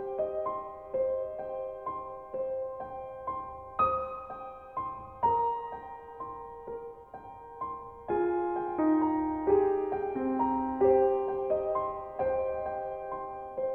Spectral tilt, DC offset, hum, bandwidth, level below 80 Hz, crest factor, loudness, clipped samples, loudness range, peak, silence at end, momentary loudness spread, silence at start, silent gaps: -10 dB/octave; under 0.1%; none; 4 kHz; -58 dBFS; 18 dB; -32 LUFS; under 0.1%; 8 LU; -14 dBFS; 0 s; 15 LU; 0 s; none